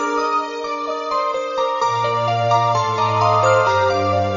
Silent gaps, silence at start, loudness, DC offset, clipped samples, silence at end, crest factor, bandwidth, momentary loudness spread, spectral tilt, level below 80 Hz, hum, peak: none; 0 s; -18 LUFS; under 0.1%; under 0.1%; 0 s; 14 dB; 7.4 kHz; 7 LU; -5 dB/octave; -58 dBFS; none; -4 dBFS